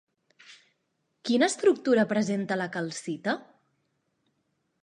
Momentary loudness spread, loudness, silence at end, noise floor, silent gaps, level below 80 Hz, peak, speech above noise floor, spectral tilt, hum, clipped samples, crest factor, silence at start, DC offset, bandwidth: 11 LU; -27 LUFS; 1.4 s; -77 dBFS; none; -80 dBFS; -10 dBFS; 51 dB; -4.5 dB/octave; none; under 0.1%; 20 dB; 0.5 s; under 0.1%; 11 kHz